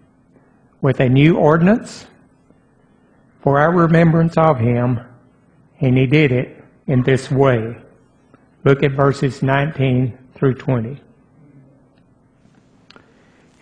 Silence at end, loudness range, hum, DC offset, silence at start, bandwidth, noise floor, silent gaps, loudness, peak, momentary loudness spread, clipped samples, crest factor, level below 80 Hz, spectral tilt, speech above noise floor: 2.65 s; 6 LU; none; under 0.1%; 0.8 s; 9.4 kHz; -54 dBFS; none; -16 LUFS; 0 dBFS; 13 LU; under 0.1%; 18 dB; -46 dBFS; -8 dB/octave; 39 dB